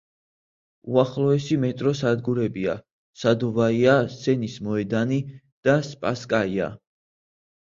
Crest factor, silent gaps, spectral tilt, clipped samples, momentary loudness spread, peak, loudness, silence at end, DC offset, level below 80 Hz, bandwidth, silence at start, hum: 20 dB; 2.92-3.13 s, 5.52-5.63 s; -7 dB/octave; under 0.1%; 9 LU; -4 dBFS; -23 LUFS; 0.9 s; under 0.1%; -58 dBFS; 7.6 kHz; 0.85 s; none